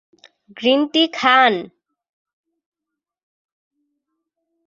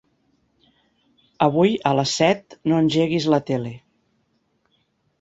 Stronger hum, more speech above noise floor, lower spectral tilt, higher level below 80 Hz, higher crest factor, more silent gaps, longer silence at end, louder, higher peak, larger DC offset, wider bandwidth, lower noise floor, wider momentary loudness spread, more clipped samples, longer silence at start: neither; first, 68 dB vs 48 dB; second, -3.5 dB/octave vs -5.5 dB/octave; second, -72 dBFS vs -60 dBFS; about the same, 20 dB vs 20 dB; neither; first, 3 s vs 1.4 s; first, -16 LUFS vs -20 LUFS; about the same, -2 dBFS vs -2 dBFS; neither; about the same, 7.6 kHz vs 8 kHz; first, -84 dBFS vs -68 dBFS; about the same, 8 LU vs 8 LU; neither; second, 0.55 s vs 1.4 s